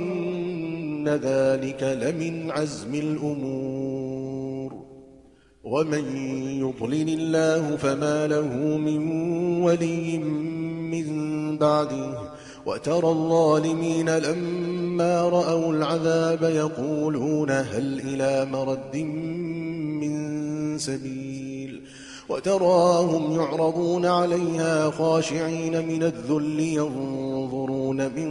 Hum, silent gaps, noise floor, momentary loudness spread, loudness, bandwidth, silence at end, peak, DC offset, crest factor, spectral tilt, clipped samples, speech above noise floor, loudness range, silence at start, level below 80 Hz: none; none; -54 dBFS; 9 LU; -25 LUFS; 11.5 kHz; 0 s; -8 dBFS; under 0.1%; 16 dB; -6 dB/octave; under 0.1%; 30 dB; 7 LU; 0 s; -60 dBFS